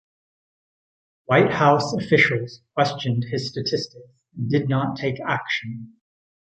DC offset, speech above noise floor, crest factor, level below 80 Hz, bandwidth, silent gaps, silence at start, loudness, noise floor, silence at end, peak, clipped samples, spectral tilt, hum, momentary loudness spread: under 0.1%; over 68 dB; 20 dB; -60 dBFS; 8.6 kHz; none; 1.3 s; -22 LUFS; under -90 dBFS; 0.65 s; -2 dBFS; under 0.1%; -6 dB/octave; none; 12 LU